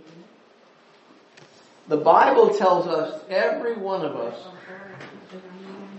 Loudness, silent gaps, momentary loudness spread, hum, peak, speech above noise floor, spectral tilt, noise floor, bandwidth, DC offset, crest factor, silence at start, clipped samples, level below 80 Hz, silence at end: -21 LUFS; none; 25 LU; none; -2 dBFS; 33 dB; -6 dB/octave; -54 dBFS; 8.2 kHz; under 0.1%; 22 dB; 0.15 s; under 0.1%; -78 dBFS; 0 s